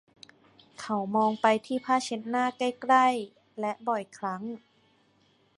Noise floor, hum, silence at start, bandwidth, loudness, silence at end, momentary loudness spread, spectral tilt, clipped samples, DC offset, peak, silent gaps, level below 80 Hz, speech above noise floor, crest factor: -66 dBFS; none; 0.8 s; 11.5 kHz; -28 LUFS; 1 s; 15 LU; -4.5 dB/octave; under 0.1%; under 0.1%; -8 dBFS; none; -78 dBFS; 39 dB; 22 dB